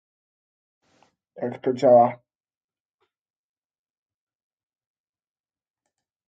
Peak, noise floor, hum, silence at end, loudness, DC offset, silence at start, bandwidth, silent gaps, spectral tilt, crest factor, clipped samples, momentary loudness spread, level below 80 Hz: -6 dBFS; under -90 dBFS; none; 4.15 s; -19 LUFS; under 0.1%; 1.4 s; 7.6 kHz; none; -8 dB/octave; 22 dB; under 0.1%; 16 LU; -76 dBFS